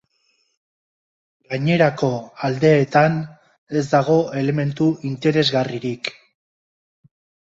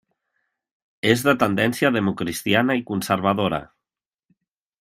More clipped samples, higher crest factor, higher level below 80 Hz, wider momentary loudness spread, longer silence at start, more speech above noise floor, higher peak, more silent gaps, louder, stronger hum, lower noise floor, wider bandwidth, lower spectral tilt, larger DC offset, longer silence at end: neither; about the same, 18 dB vs 22 dB; about the same, -60 dBFS vs -58 dBFS; first, 11 LU vs 7 LU; first, 1.5 s vs 1.05 s; second, 47 dB vs 69 dB; about the same, -2 dBFS vs -2 dBFS; first, 3.58-3.67 s vs none; about the same, -19 LUFS vs -21 LUFS; neither; second, -66 dBFS vs -89 dBFS; second, 7.8 kHz vs 16 kHz; first, -6.5 dB/octave vs -5 dB/octave; neither; first, 1.45 s vs 1.15 s